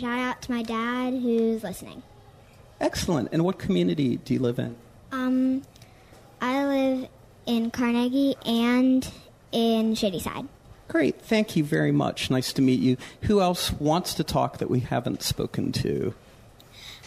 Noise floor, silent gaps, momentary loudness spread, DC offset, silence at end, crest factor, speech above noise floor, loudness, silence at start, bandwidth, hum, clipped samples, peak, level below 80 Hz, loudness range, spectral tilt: -51 dBFS; none; 9 LU; under 0.1%; 0 s; 16 dB; 26 dB; -25 LUFS; 0 s; 15.5 kHz; none; under 0.1%; -10 dBFS; -50 dBFS; 4 LU; -5.5 dB/octave